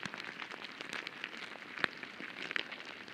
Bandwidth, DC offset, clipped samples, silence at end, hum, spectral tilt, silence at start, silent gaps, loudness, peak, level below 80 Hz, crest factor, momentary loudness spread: 16 kHz; under 0.1%; under 0.1%; 0 s; none; -2.5 dB/octave; 0 s; none; -41 LUFS; -10 dBFS; -82 dBFS; 34 dB; 7 LU